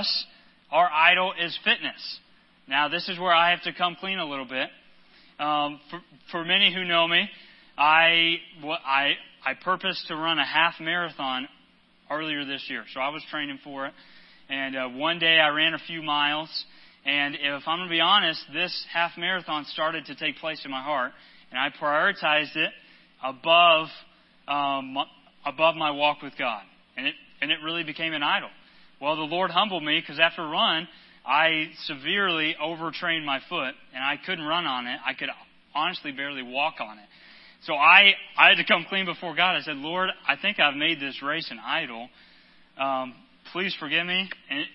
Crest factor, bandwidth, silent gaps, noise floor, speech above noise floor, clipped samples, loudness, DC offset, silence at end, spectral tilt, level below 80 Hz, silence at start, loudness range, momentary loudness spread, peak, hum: 26 dB; 5.8 kHz; none; -60 dBFS; 34 dB; under 0.1%; -24 LUFS; under 0.1%; 0.05 s; -6.5 dB/octave; -74 dBFS; 0 s; 9 LU; 15 LU; 0 dBFS; none